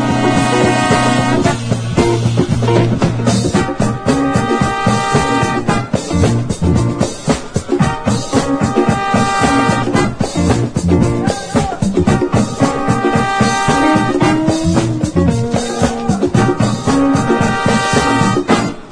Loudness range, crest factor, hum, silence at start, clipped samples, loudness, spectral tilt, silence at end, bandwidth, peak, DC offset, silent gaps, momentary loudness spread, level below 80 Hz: 2 LU; 14 dB; none; 0 s; under 0.1%; -14 LUFS; -5.5 dB/octave; 0 s; 10.5 kHz; 0 dBFS; under 0.1%; none; 4 LU; -32 dBFS